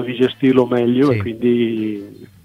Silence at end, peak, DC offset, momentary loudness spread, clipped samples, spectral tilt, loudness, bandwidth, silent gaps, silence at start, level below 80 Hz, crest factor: 0.2 s; 0 dBFS; under 0.1%; 9 LU; under 0.1%; -8 dB/octave; -17 LUFS; 6.6 kHz; none; 0 s; -56 dBFS; 16 dB